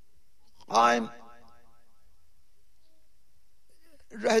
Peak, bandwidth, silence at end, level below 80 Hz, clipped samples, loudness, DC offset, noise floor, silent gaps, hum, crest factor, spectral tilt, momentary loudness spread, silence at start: -10 dBFS; 14 kHz; 0 s; -68 dBFS; under 0.1%; -26 LUFS; 0.5%; -70 dBFS; none; none; 22 dB; -3 dB/octave; 18 LU; 0.7 s